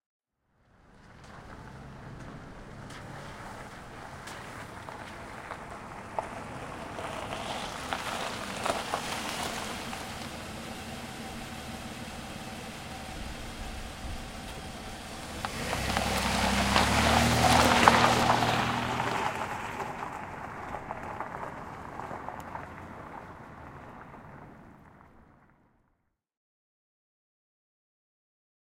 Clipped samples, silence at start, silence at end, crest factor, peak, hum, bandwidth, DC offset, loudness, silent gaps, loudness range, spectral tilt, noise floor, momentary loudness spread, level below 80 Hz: under 0.1%; 0.9 s; 3.4 s; 32 dB; -2 dBFS; none; 16 kHz; under 0.1%; -31 LUFS; none; 21 LU; -3.5 dB/octave; -76 dBFS; 22 LU; -46 dBFS